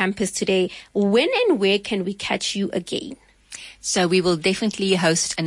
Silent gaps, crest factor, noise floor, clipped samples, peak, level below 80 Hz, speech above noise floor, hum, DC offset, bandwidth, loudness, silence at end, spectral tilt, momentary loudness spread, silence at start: none; 16 dB; -41 dBFS; under 0.1%; -6 dBFS; -56 dBFS; 20 dB; none; under 0.1%; 11.5 kHz; -21 LUFS; 0 s; -4 dB/octave; 11 LU; 0 s